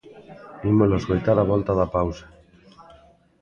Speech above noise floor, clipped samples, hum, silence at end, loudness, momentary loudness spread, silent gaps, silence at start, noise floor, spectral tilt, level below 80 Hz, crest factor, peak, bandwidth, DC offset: 33 dB; under 0.1%; none; 0.6 s; -22 LUFS; 21 LU; none; 0.15 s; -53 dBFS; -9 dB/octave; -42 dBFS; 18 dB; -6 dBFS; 7 kHz; under 0.1%